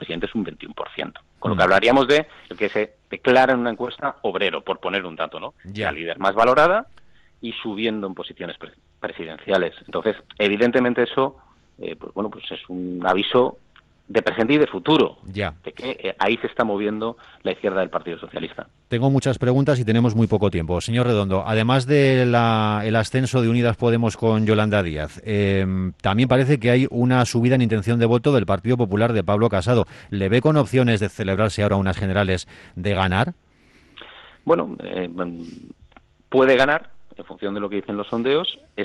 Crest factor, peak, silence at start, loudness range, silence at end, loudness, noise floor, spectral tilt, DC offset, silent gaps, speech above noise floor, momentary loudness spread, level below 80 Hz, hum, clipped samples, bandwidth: 16 dB; -4 dBFS; 0 s; 6 LU; 0 s; -21 LUFS; -54 dBFS; -6.5 dB/octave; under 0.1%; none; 34 dB; 15 LU; -50 dBFS; none; under 0.1%; 11.5 kHz